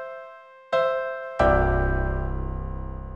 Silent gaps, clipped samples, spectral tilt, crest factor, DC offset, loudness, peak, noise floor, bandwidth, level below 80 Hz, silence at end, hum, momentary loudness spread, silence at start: none; under 0.1%; -8 dB/octave; 18 dB; under 0.1%; -25 LUFS; -8 dBFS; -45 dBFS; 7.6 kHz; -30 dBFS; 0 s; none; 16 LU; 0 s